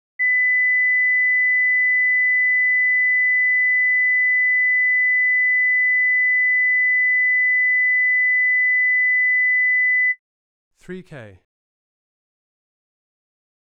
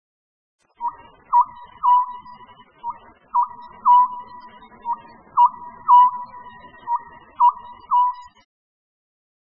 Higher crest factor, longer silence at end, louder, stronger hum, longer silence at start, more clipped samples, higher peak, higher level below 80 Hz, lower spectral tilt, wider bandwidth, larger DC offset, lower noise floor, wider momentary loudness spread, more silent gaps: second, 4 dB vs 18 dB; first, 2.35 s vs 1.4 s; first, -15 LUFS vs -19 LUFS; first, 50 Hz at -85 dBFS vs none; second, 0.2 s vs 0.8 s; neither; second, -14 dBFS vs -4 dBFS; second, -70 dBFS vs -62 dBFS; first, -5.5 dB/octave vs -1 dB/octave; second, 2.7 kHz vs 4.1 kHz; about the same, 0.1% vs 0.1%; first, under -90 dBFS vs -47 dBFS; second, 0 LU vs 21 LU; first, 10.19-10.71 s vs none